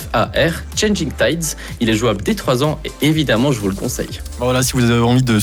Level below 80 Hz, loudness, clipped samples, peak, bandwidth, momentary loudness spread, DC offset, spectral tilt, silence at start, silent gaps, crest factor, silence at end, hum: -32 dBFS; -17 LUFS; under 0.1%; -4 dBFS; 19 kHz; 8 LU; under 0.1%; -5 dB/octave; 0 s; none; 12 dB; 0 s; none